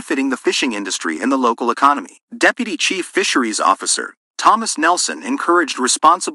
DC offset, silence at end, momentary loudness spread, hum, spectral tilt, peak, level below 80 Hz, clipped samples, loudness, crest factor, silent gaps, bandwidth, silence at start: under 0.1%; 0 s; 6 LU; none; -1 dB/octave; 0 dBFS; -70 dBFS; under 0.1%; -16 LUFS; 18 dB; 2.23-2.27 s, 4.17-4.34 s; 12 kHz; 0 s